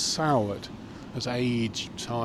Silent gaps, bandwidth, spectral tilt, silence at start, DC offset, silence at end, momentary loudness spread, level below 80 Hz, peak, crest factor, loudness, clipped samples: none; 14 kHz; -4.5 dB/octave; 0 s; under 0.1%; 0 s; 14 LU; -54 dBFS; -12 dBFS; 18 dB; -29 LUFS; under 0.1%